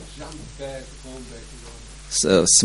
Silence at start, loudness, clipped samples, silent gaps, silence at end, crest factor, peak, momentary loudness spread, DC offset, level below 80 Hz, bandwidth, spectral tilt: 0 s; -18 LUFS; under 0.1%; none; 0 s; 22 dB; -2 dBFS; 23 LU; under 0.1%; -42 dBFS; 11.5 kHz; -2.5 dB/octave